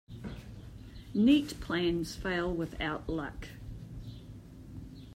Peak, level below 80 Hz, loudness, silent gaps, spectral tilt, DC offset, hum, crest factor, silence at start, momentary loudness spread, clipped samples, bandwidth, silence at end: -14 dBFS; -50 dBFS; -31 LUFS; none; -6 dB/octave; under 0.1%; none; 20 dB; 0.1 s; 22 LU; under 0.1%; 16 kHz; 0 s